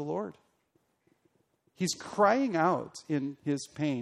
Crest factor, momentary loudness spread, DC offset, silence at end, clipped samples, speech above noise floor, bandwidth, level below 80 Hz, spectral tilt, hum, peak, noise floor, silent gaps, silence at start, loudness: 22 dB; 10 LU; under 0.1%; 0 s; under 0.1%; 44 dB; 13.5 kHz; -74 dBFS; -5 dB/octave; none; -10 dBFS; -74 dBFS; none; 0 s; -30 LUFS